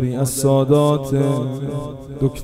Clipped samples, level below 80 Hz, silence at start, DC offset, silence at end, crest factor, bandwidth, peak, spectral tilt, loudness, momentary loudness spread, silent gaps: under 0.1%; -42 dBFS; 0 s; under 0.1%; 0 s; 16 dB; 16 kHz; -2 dBFS; -6.5 dB/octave; -18 LUFS; 12 LU; none